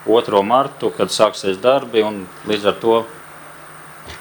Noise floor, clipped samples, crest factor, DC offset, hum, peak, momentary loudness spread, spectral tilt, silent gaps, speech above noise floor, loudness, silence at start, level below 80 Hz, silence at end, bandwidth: -38 dBFS; under 0.1%; 18 dB; under 0.1%; none; 0 dBFS; 21 LU; -4.5 dB/octave; none; 21 dB; -17 LUFS; 0 s; -56 dBFS; 0 s; over 20 kHz